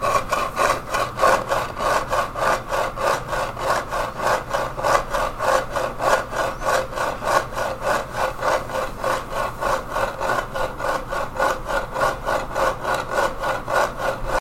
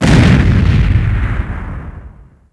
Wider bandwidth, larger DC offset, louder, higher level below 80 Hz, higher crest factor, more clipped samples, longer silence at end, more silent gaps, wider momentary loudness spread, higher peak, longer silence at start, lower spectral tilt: first, 16.5 kHz vs 11 kHz; neither; second, -22 LUFS vs -12 LUFS; second, -36 dBFS vs -18 dBFS; first, 20 dB vs 12 dB; second, under 0.1% vs 0.1%; second, 0 s vs 0.4 s; neither; second, 5 LU vs 19 LU; about the same, -2 dBFS vs 0 dBFS; about the same, 0 s vs 0 s; second, -3.5 dB/octave vs -7 dB/octave